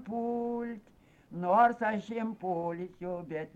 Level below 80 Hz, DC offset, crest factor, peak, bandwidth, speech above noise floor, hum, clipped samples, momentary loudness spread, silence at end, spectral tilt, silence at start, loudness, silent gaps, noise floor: -68 dBFS; under 0.1%; 18 dB; -14 dBFS; 7.8 kHz; 30 dB; none; under 0.1%; 15 LU; 0.1 s; -8 dB/octave; 0 s; -32 LUFS; none; -61 dBFS